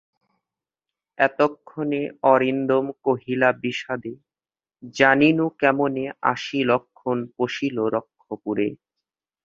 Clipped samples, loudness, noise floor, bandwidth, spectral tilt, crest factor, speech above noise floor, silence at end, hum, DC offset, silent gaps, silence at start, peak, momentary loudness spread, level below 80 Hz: under 0.1%; -22 LUFS; under -90 dBFS; 7.6 kHz; -6 dB/octave; 22 dB; over 68 dB; 0.7 s; none; under 0.1%; none; 1.2 s; 0 dBFS; 11 LU; -66 dBFS